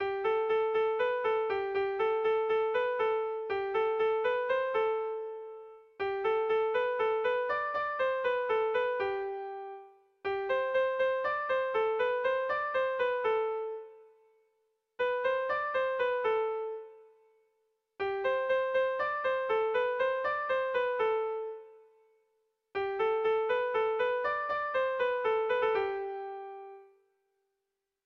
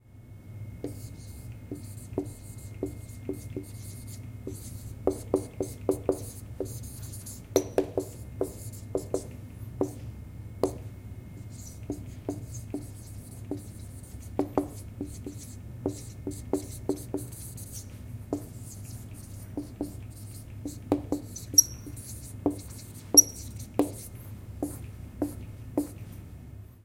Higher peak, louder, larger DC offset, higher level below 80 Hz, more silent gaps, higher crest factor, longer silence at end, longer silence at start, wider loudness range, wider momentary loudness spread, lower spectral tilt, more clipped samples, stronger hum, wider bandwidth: second, -20 dBFS vs -4 dBFS; about the same, -31 LUFS vs -31 LUFS; neither; second, -70 dBFS vs -50 dBFS; neither; second, 12 dB vs 30 dB; first, 1.2 s vs 0 s; about the same, 0 s vs 0.05 s; second, 3 LU vs 15 LU; second, 10 LU vs 14 LU; first, -5 dB/octave vs -3.5 dB/octave; neither; neither; second, 6 kHz vs 16.5 kHz